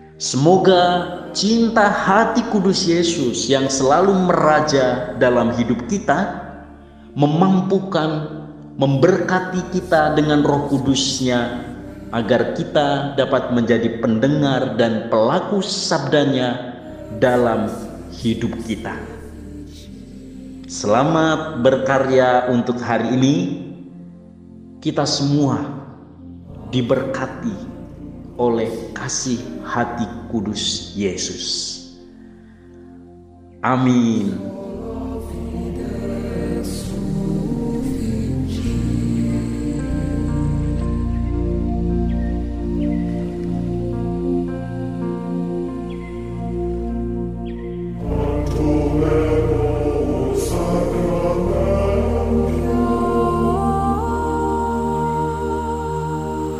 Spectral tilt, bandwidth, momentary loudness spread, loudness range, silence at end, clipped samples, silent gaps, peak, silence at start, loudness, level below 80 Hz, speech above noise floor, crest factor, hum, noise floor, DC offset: -5.5 dB/octave; 14.5 kHz; 14 LU; 8 LU; 0 s; under 0.1%; none; 0 dBFS; 0 s; -19 LUFS; -32 dBFS; 25 dB; 20 dB; none; -42 dBFS; under 0.1%